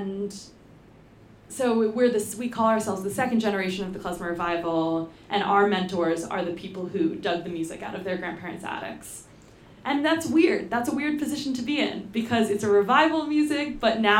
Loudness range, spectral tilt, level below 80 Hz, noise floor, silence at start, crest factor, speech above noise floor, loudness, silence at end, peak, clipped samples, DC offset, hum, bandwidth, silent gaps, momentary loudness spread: 6 LU; -4.5 dB/octave; -58 dBFS; -51 dBFS; 0 s; 20 dB; 26 dB; -25 LUFS; 0 s; -4 dBFS; under 0.1%; under 0.1%; none; 16.5 kHz; none; 12 LU